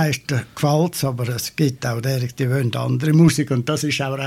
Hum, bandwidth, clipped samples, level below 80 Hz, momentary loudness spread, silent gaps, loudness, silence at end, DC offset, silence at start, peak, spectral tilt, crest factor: none; 16 kHz; under 0.1%; -54 dBFS; 9 LU; none; -20 LUFS; 0 s; under 0.1%; 0 s; -2 dBFS; -5.5 dB/octave; 16 dB